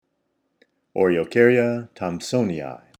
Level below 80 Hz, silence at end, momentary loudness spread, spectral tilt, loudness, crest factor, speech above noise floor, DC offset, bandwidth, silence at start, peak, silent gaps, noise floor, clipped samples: -62 dBFS; 0.25 s; 13 LU; -6 dB/octave; -21 LUFS; 20 dB; 52 dB; under 0.1%; 12.5 kHz; 0.95 s; -2 dBFS; none; -73 dBFS; under 0.1%